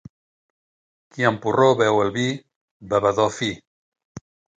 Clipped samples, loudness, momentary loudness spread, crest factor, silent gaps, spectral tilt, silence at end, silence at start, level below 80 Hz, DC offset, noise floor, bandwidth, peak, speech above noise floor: under 0.1%; -20 LUFS; 14 LU; 20 dB; 2.56-2.80 s, 3.67-3.92 s, 4.05-4.15 s; -5 dB/octave; 0.4 s; 1.15 s; -58 dBFS; under 0.1%; under -90 dBFS; 9.4 kHz; -2 dBFS; over 70 dB